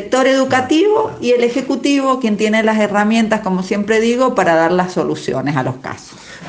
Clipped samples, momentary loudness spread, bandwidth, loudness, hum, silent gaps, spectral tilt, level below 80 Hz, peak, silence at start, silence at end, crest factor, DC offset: under 0.1%; 7 LU; 9.8 kHz; -15 LUFS; none; none; -5.5 dB/octave; -52 dBFS; 0 dBFS; 0 s; 0 s; 14 dB; under 0.1%